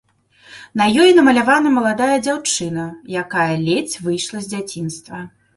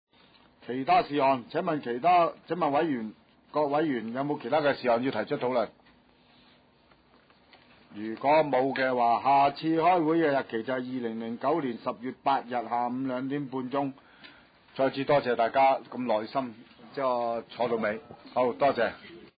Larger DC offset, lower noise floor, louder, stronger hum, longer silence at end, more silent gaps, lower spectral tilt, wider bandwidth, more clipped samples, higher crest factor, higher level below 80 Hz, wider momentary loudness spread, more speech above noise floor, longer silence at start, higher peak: neither; second, -49 dBFS vs -62 dBFS; first, -17 LUFS vs -28 LUFS; neither; first, 0.3 s vs 0.15 s; neither; second, -4 dB/octave vs -9.5 dB/octave; first, 12 kHz vs 5 kHz; neither; about the same, 16 dB vs 14 dB; first, -56 dBFS vs -70 dBFS; first, 16 LU vs 11 LU; about the same, 32 dB vs 35 dB; second, 0.5 s vs 0.65 s; first, -2 dBFS vs -14 dBFS